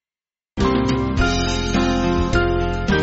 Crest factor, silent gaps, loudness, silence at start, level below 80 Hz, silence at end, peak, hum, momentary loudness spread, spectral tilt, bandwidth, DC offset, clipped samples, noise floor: 16 dB; none; -19 LUFS; 0.55 s; -26 dBFS; 0 s; -4 dBFS; none; 2 LU; -5 dB/octave; 8 kHz; under 0.1%; under 0.1%; under -90 dBFS